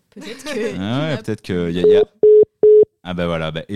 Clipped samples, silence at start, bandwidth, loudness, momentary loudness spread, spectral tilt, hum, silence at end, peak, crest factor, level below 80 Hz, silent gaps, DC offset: under 0.1%; 0.15 s; 10 kHz; -16 LUFS; 13 LU; -6.5 dB/octave; none; 0 s; -4 dBFS; 12 dB; -48 dBFS; none; 0.7%